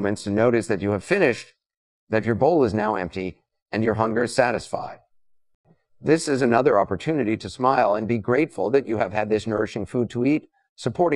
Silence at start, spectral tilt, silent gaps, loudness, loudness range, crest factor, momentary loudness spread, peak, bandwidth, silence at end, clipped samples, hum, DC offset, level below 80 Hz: 0 s; -6 dB/octave; 1.77-2.07 s, 3.62-3.66 s, 5.55-5.64 s, 10.69-10.76 s; -23 LUFS; 3 LU; 20 dB; 11 LU; -4 dBFS; 12 kHz; 0 s; under 0.1%; none; 0.1%; -56 dBFS